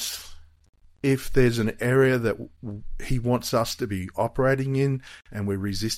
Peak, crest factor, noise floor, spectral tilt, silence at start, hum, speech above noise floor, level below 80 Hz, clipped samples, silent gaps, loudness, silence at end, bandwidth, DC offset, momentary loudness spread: -6 dBFS; 18 dB; -44 dBFS; -5.5 dB/octave; 0 s; none; 20 dB; -40 dBFS; under 0.1%; 0.69-0.73 s; -25 LUFS; 0 s; 16 kHz; under 0.1%; 15 LU